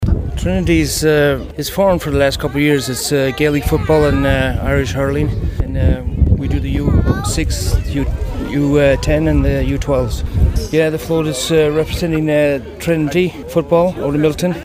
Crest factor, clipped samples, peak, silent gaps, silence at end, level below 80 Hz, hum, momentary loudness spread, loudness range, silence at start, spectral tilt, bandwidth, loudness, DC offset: 14 dB; under 0.1%; 0 dBFS; none; 0 s; -22 dBFS; none; 6 LU; 2 LU; 0 s; -6 dB/octave; 16 kHz; -16 LUFS; under 0.1%